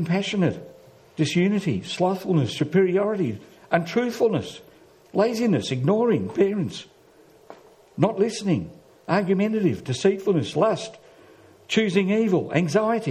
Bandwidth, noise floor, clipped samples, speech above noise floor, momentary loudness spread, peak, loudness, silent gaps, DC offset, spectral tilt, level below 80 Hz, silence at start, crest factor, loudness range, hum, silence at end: 14 kHz; -53 dBFS; under 0.1%; 31 dB; 9 LU; -4 dBFS; -23 LUFS; none; under 0.1%; -6.5 dB/octave; -64 dBFS; 0 s; 20 dB; 2 LU; none; 0 s